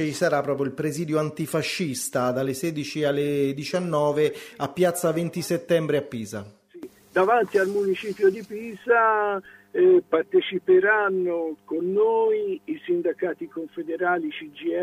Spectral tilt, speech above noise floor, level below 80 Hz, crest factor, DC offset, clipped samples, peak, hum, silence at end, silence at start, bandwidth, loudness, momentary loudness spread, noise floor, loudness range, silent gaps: -5.5 dB/octave; 20 dB; -68 dBFS; 16 dB; under 0.1%; under 0.1%; -8 dBFS; none; 0 s; 0 s; 15.5 kHz; -24 LUFS; 13 LU; -44 dBFS; 4 LU; none